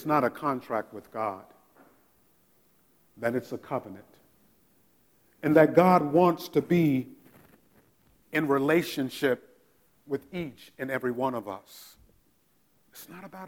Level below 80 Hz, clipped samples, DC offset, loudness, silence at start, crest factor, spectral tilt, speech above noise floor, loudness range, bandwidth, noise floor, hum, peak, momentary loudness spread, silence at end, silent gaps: -68 dBFS; under 0.1%; under 0.1%; -27 LUFS; 0 s; 24 dB; -7 dB/octave; 42 dB; 13 LU; 19.5 kHz; -68 dBFS; none; -6 dBFS; 23 LU; 0 s; none